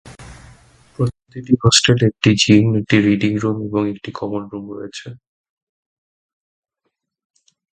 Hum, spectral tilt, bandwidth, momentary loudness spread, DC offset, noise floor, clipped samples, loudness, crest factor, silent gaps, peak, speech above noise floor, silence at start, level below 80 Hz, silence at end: none; -4.5 dB/octave; 11 kHz; 18 LU; under 0.1%; -74 dBFS; under 0.1%; -16 LUFS; 20 dB; none; 0 dBFS; 58 dB; 0.05 s; -46 dBFS; 2.55 s